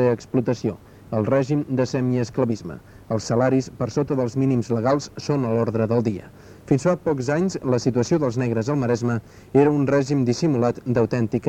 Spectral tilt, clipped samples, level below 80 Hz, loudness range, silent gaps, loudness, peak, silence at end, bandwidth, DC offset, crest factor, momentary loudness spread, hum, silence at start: -7 dB/octave; under 0.1%; -54 dBFS; 2 LU; none; -22 LUFS; -4 dBFS; 0 s; 9.4 kHz; under 0.1%; 18 dB; 7 LU; none; 0 s